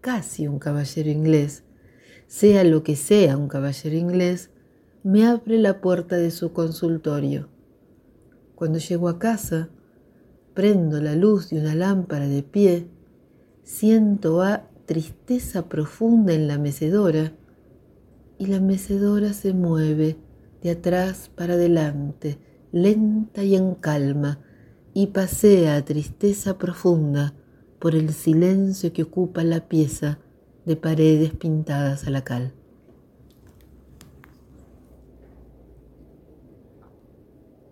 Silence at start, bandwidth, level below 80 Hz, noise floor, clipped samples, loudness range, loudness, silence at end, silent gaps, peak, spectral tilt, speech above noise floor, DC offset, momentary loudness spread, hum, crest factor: 0.05 s; 16.5 kHz; -52 dBFS; -55 dBFS; under 0.1%; 6 LU; -21 LUFS; 5.2 s; none; -4 dBFS; -7 dB/octave; 35 dB; under 0.1%; 12 LU; none; 18 dB